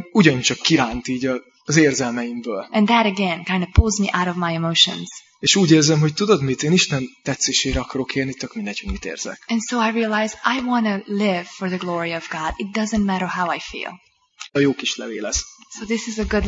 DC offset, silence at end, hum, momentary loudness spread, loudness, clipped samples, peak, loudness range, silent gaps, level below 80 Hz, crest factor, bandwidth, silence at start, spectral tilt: under 0.1%; 0 s; none; 12 LU; -20 LUFS; under 0.1%; 0 dBFS; 6 LU; none; -36 dBFS; 20 dB; 8 kHz; 0 s; -4 dB/octave